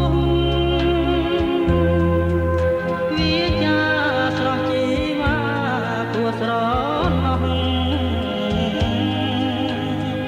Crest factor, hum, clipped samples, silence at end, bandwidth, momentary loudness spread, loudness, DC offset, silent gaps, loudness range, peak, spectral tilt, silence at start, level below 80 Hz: 14 dB; none; under 0.1%; 0 s; 10.5 kHz; 4 LU; -20 LUFS; under 0.1%; none; 2 LU; -6 dBFS; -7 dB/octave; 0 s; -30 dBFS